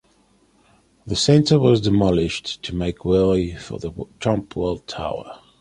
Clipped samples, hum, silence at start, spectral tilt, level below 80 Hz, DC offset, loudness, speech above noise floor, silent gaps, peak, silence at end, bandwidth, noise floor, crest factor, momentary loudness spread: under 0.1%; none; 1.05 s; -6 dB/octave; -40 dBFS; under 0.1%; -20 LUFS; 39 dB; none; -2 dBFS; 0.25 s; 11.5 kHz; -59 dBFS; 18 dB; 15 LU